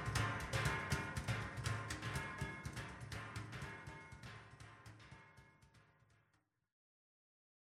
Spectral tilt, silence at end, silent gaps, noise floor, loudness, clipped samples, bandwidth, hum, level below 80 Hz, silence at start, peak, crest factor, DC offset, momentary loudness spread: -4.5 dB/octave; 1.95 s; none; -81 dBFS; -44 LUFS; under 0.1%; 15.5 kHz; none; -58 dBFS; 0 s; -24 dBFS; 22 dB; under 0.1%; 19 LU